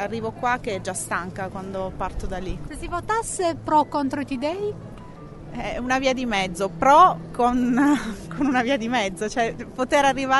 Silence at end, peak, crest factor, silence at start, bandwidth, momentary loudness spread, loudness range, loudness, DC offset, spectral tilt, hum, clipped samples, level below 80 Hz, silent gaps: 0 s; -4 dBFS; 18 dB; 0 s; 11.5 kHz; 13 LU; 7 LU; -23 LUFS; under 0.1%; -4.5 dB/octave; none; under 0.1%; -42 dBFS; none